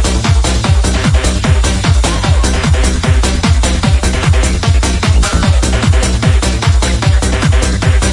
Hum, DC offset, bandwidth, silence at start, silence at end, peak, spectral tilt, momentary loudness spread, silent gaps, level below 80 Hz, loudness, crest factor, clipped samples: none; under 0.1%; 11.5 kHz; 0 s; 0 s; 0 dBFS; -4.5 dB/octave; 1 LU; none; -14 dBFS; -12 LUFS; 10 dB; under 0.1%